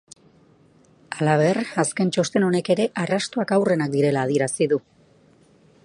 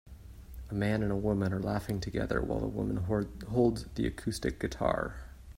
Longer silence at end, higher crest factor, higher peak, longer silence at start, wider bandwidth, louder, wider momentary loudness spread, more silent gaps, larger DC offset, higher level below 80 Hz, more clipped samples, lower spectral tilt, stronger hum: first, 1.05 s vs 0 s; about the same, 18 dB vs 18 dB; first, -4 dBFS vs -14 dBFS; first, 1.1 s vs 0.05 s; second, 11.5 kHz vs 16 kHz; first, -22 LUFS vs -33 LUFS; second, 4 LU vs 10 LU; neither; neither; second, -66 dBFS vs -46 dBFS; neither; second, -5.5 dB/octave vs -7 dB/octave; neither